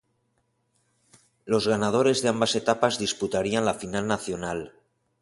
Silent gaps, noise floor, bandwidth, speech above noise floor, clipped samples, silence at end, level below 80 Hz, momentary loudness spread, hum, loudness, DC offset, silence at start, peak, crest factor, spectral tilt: none; -72 dBFS; 11.5 kHz; 47 dB; under 0.1%; 0.55 s; -58 dBFS; 9 LU; none; -25 LUFS; under 0.1%; 1.45 s; -4 dBFS; 22 dB; -4 dB/octave